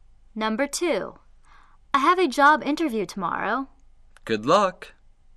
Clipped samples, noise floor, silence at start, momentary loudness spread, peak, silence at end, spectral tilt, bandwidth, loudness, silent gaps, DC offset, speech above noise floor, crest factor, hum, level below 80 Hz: under 0.1%; -52 dBFS; 0.35 s; 12 LU; -6 dBFS; 0.45 s; -4 dB/octave; 13 kHz; -23 LUFS; none; under 0.1%; 29 dB; 18 dB; none; -54 dBFS